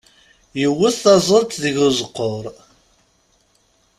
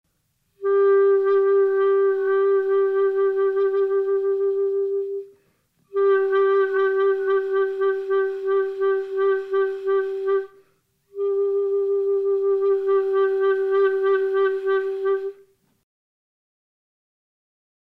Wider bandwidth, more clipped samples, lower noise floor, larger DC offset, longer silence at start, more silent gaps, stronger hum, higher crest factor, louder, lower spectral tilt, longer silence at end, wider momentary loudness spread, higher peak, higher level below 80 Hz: first, 14.5 kHz vs 4.2 kHz; neither; second, -60 dBFS vs -70 dBFS; neither; about the same, 0.55 s vs 0.6 s; neither; neither; first, 18 dB vs 10 dB; first, -17 LUFS vs -21 LUFS; about the same, -4.5 dB/octave vs -5.5 dB/octave; second, 1.45 s vs 2.5 s; first, 16 LU vs 6 LU; first, -2 dBFS vs -12 dBFS; first, -56 dBFS vs -74 dBFS